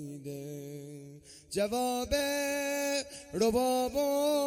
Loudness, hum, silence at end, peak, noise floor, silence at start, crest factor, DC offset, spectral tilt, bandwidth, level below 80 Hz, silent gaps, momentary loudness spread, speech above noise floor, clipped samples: -31 LUFS; none; 0 s; -16 dBFS; -51 dBFS; 0 s; 16 dB; under 0.1%; -3.5 dB/octave; 16.5 kHz; -54 dBFS; none; 17 LU; 21 dB; under 0.1%